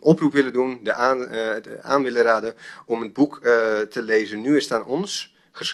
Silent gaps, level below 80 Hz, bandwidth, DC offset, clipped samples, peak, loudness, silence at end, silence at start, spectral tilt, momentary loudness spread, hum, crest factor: none; -66 dBFS; 12.5 kHz; under 0.1%; under 0.1%; -2 dBFS; -22 LUFS; 0 s; 0.05 s; -5 dB/octave; 11 LU; none; 20 dB